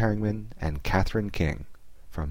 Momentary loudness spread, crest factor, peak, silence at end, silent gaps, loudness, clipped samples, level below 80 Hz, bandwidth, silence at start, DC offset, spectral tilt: 13 LU; 18 dB; -10 dBFS; 0 s; none; -29 LUFS; under 0.1%; -36 dBFS; 16.5 kHz; 0 s; 0.8%; -7 dB/octave